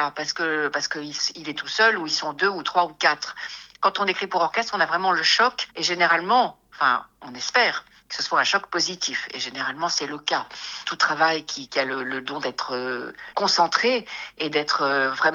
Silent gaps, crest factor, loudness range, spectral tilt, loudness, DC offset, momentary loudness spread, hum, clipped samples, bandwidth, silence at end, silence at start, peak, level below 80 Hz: none; 22 dB; 4 LU; -1.5 dB/octave; -23 LUFS; under 0.1%; 10 LU; none; under 0.1%; 12 kHz; 0 s; 0 s; -2 dBFS; -68 dBFS